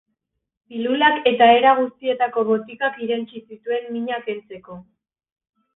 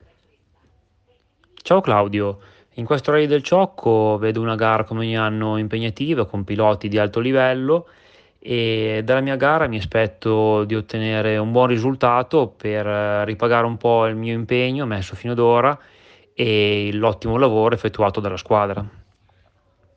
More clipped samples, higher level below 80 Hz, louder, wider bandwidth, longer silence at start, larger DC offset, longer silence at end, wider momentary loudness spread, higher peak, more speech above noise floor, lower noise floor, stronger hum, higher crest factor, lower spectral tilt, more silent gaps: neither; second, -66 dBFS vs -50 dBFS; about the same, -19 LUFS vs -19 LUFS; second, 4 kHz vs 7.8 kHz; second, 0.7 s vs 1.65 s; neither; about the same, 0.95 s vs 1.05 s; first, 21 LU vs 7 LU; about the same, -2 dBFS vs -4 dBFS; first, 57 dB vs 43 dB; first, -77 dBFS vs -62 dBFS; neither; about the same, 18 dB vs 16 dB; first, -9 dB/octave vs -7 dB/octave; neither